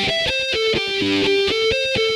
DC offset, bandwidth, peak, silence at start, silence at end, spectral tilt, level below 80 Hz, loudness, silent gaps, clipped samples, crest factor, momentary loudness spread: under 0.1%; 13.5 kHz; -10 dBFS; 0 s; 0 s; -3.5 dB/octave; -44 dBFS; -18 LUFS; none; under 0.1%; 10 dB; 2 LU